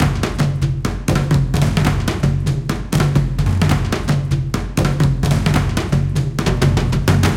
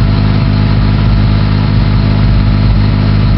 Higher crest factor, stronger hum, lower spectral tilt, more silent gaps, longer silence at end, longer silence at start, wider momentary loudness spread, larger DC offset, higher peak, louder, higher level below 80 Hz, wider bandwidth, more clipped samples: first, 16 dB vs 8 dB; neither; second, -6 dB/octave vs -10 dB/octave; neither; about the same, 0 s vs 0 s; about the same, 0 s vs 0 s; first, 4 LU vs 1 LU; neither; about the same, 0 dBFS vs 0 dBFS; second, -17 LUFS vs -10 LUFS; second, -26 dBFS vs -14 dBFS; first, 16.5 kHz vs 5.8 kHz; neither